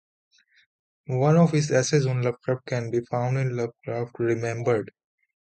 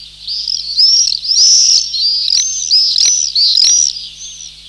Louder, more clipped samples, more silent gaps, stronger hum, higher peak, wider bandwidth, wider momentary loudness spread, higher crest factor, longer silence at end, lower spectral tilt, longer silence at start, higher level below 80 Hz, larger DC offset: second, -25 LUFS vs -8 LUFS; neither; neither; second, none vs 50 Hz at -50 dBFS; second, -8 dBFS vs 0 dBFS; second, 9 kHz vs 13 kHz; second, 11 LU vs 14 LU; first, 18 dB vs 12 dB; first, 0.65 s vs 0 s; first, -6.5 dB/octave vs 4.5 dB/octave; first, 1.1 s vs 0 s; second, -64 dBFS vs -48 dBFS; neither